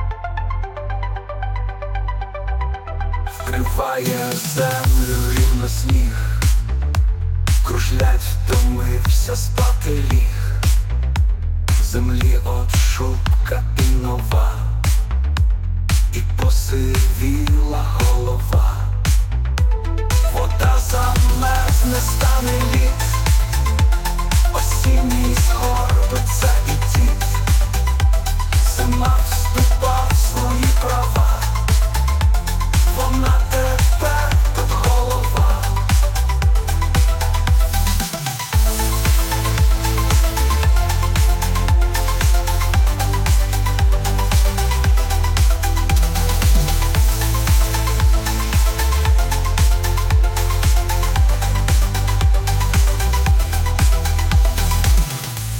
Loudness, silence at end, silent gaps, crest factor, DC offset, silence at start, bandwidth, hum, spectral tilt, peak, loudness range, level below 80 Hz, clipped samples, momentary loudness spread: -18 LUFS; 0 s; none; 10 dB; under 0.1%; 0 s; 17 kHz; none; -4.5 dB/octave; -4 dBFS; 2 LU; -18 dBFS; under 0.1%; 4 LU